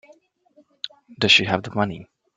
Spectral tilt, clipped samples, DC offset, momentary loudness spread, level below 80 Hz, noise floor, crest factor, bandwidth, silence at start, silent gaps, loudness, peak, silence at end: -3.5 dB/octave; under 0.1%; under 0.1%; 20 LU; -60 dBFS; -59 dBFS; 22 dB; 9.4 kHz; 0.85 s; none; -19 LUFS; -2 dBFS; 0.35 s